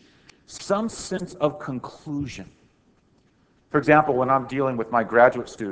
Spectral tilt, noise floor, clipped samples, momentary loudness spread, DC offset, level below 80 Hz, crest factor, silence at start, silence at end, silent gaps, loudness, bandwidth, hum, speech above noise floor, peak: -6 dB/octave; -62 dBFS; under 0.1%; 16 LU; under 0.1%; -56 dBFS; 22 dB; 0.5 s; 0 s; none; -22 LUFS; 8 kHz; none; 39 dB; -2 dBFS